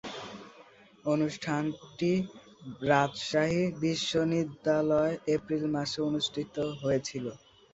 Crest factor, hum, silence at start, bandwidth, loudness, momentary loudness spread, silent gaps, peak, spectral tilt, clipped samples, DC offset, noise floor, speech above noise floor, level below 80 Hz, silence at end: 22 dB; none; 0.05 s; 8.2 kHz; -30 LUFS; 14 LU; none; -10 dBFS; -5.5 dB/octave; under 0.1%; under 0.1%; -56 dBFS; 27 dB; -64 dBFS; 0.35 s